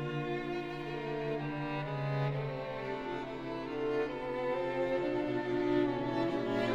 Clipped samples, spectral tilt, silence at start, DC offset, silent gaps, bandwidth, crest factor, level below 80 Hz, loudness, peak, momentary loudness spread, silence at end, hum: under 0.1%; -7.5 dB/octave; 0 s; under 0.1%; none; 8.4 kHz; 14 dB; -58 dBFS; -35 LUFS; -20 dBFS; 7 LU; 0 s; none